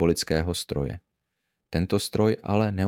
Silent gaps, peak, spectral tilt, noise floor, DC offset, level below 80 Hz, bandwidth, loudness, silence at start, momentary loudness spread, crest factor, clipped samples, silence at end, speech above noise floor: none; -8 dBFS; -5.5 dB/octave; -80 dBFS; under 0.1%; -44 dBFS; 17 kHz; -26 LUFS; 0 s; 9 LU; 18 dB; under 0.1%; 0 s; 55 dB